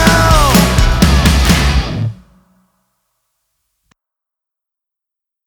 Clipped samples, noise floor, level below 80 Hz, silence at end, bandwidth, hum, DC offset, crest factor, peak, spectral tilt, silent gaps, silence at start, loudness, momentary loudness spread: under 0.1%; -83 dBFS; -18 dBFS; 3.35 s; over 20 kHz; none; under 0.1%; 14 dB; 0 dBFS; -4.5 dB/octave; none; 0 s; -11 LUFS; 11 LU